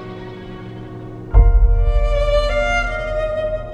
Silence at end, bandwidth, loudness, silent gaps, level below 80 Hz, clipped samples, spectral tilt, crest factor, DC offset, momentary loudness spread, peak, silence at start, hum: 0 s; 7.4 kHz; -18 LUFS; none; -18 dBFS; under 0.1%; -6.5 dB/octave; 16 dB; under 0.1%; 17 LU; 0 dBFS; 0 s; none